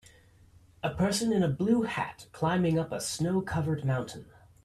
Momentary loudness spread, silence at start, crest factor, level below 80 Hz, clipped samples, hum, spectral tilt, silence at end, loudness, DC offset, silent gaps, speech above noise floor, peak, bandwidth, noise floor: 9 LU; 0.85 s; 16 dB; -56 dBFS; under 0.1%; none; -5.5 dB/octave; 0.4 s; -30 LUFS; under 0.1%; none; 29 dB; -14 dBFS; 14 kHz; -58 dBFS